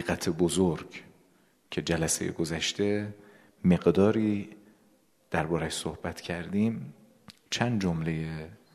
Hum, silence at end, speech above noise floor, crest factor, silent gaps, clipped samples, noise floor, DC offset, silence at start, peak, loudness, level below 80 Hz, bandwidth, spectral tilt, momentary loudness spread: none; 0.2 s; 37 dB; 22 dB; none; under 0.1%; -65 dBFS; under 0.1%; 0 s; -8 dBFS; -29 LUFS; -54 dBFS; 13.5 kHz; -5 dB/octave; 14 LU